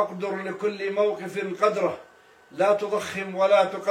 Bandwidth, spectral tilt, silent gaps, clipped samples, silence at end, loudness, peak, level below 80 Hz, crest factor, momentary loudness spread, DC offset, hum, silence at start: 14.5 kHz; -5 dB/octave; none; under 0.1%; 0 s; -25 LUFS; -6 dBFS; -74 dBFS; 18 dB; 10 LU; under 0.1%; none; 0 s